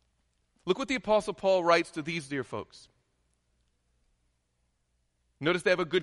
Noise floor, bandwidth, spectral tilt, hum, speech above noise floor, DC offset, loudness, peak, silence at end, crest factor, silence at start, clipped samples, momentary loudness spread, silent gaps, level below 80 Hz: -76 dBFS; 11.5 kHz; -5 dB/octave; 60 Hz at -65 dBFS; 47 dB; under 0.1%; -29 LUFS; -10 dBFS; 0 s; 20 dB; 0.65 s; under 0.1%; 14 LU; none; -64 dBFS